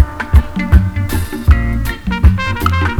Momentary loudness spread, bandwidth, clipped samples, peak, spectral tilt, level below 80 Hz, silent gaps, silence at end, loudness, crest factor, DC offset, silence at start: 6 LU; 17.5 kHz; 0.9%; 0 dBFS; -6.5 dB/octave; -14 dBFS; none; 0 s; -14 LUFS; 12 dB; under 0.1%; 0 s